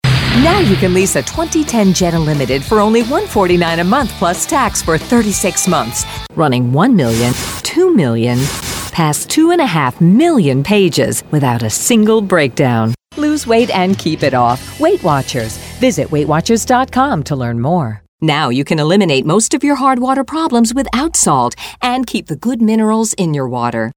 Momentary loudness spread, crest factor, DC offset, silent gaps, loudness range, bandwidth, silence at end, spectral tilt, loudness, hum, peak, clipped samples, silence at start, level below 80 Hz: 6 LU; 12 dB; under 0.1%; 18.08-18.18 s; 2 LU; over 20 kHz; 0.05 s; -5 dB/octave; -13 LUFS; none; 0 dBFS; under 0.1%; 0.05 s; -36 dBFS